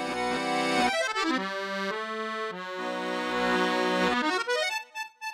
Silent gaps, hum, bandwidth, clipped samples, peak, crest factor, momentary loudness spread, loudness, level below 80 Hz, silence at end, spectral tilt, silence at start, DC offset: none; none; 16 kHz; under 0.1%; -12 dBFS; 16 dB; 8 LU; -28 LUFS; -62 dBFS; 0 s; -3.5 dB/octave; 0 s; under 0.1%